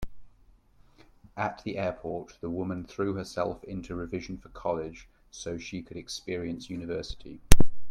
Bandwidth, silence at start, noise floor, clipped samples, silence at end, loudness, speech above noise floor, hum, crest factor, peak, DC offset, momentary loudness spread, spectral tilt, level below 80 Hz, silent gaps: 16 kHz; 0 s; -59 dBFS; under 0.1%; 0 s; -33 LUFS; 34 dB; none; 24 dB; 0 dBFS; under 0.1%; 14 LU; -5 dB/octave; -36 dBFS; none